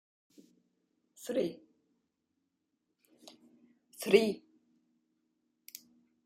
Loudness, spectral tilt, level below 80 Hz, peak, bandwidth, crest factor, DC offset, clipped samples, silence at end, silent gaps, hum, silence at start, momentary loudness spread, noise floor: -32 LUFS; -4.5 dB/octave; -82 dBFS; -12 dBFS; 16 kHz; 28 dB; under 0.1%; under 0.1%; 1.85 s; none; none; 1.2 s; 24 LU; -83 dBFS